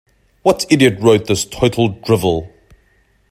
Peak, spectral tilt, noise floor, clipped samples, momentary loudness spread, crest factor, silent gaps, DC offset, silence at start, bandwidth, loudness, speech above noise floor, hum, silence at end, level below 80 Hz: 0 dBFS; -5 dB/octave; -56 dBFS; under 0.1%; 7 LU; 16 dB; none; under 0.1%; 0.45 s; 16 kHz; -15 LUFS; 42 dB; none; 0.8 s; -44 dBFS